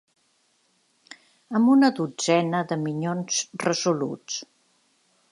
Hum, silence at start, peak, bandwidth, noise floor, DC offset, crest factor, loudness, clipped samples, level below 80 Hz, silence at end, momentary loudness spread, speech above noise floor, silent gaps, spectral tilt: none; 1.1 s; -6 dBFS; 11.5 kHz; -67 dBFS; under 0.1%; 20 dB; -24 LUFS; under 0.1%; -76 dBFS; 0.85 s; 11 LU; 44 dB; none; -4.5 dB/octave